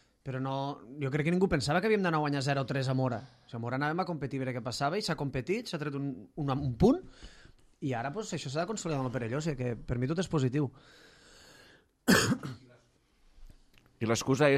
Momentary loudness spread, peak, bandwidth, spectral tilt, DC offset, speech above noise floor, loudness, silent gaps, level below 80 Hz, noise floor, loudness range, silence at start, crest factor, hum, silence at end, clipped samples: 11 LU; -10 dBFS; 14.5 kHz; -5.5 dB/octave; under 0.1%; 35 dB; -32 LUFS; none; -54 dBFS; -66 dBFS; 4 LU; 0.25 s; 22 dB; none; 0 s; under 0.1%